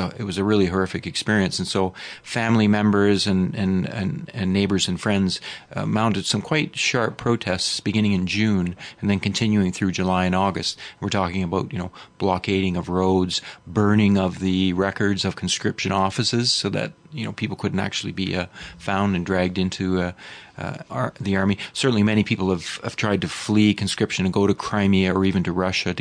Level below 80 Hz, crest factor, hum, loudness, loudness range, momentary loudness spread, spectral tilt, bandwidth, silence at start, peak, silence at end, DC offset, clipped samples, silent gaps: -52 dBFS; 16 dB; none; -22 LUFS; 3 LU; 9 LU; -5 dB/octave; 10 kHz; 0 s; -6 dBFS; 0 s; under 0.1%; under 0.1%; none